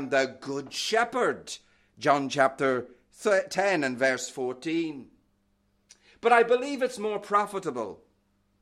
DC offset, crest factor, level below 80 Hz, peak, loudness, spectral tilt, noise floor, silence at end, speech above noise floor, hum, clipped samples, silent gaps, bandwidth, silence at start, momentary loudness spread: under 0.1%; 20 dB; -72 dBFS; -8 dBFS; -27 LUFS; -3.5 dB/octave; -70 dBFS; 0.65 s; 43 dB; 50 Hz at -70 dBFS; under 0.1%; none; 14.5 kHz; 0 s; 13 LU